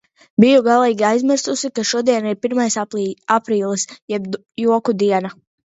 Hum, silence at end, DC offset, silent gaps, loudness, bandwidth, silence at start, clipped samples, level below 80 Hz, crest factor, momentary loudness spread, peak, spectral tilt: none; 0.35 s; under 0.1%; 4.02-4.08 s; -17 LUFS; 8.2 kHz; 0.4 s; under 0.1%; -66 dBFS; 18 dB; 11 LU; 0 dBFS; -4.5 dB/octave